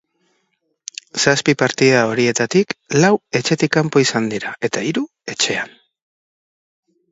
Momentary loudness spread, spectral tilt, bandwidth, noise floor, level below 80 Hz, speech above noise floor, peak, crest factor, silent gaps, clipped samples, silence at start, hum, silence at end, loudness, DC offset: 12 LU; -4 dB/octave; 8 kHz; -69 dBFS; -60 dBFS; 52 dB; 0 dBFS; 18 dB; none; under 0.1%; 1.15 s; none; 1.45 s; -17 LUFS; under 0.1%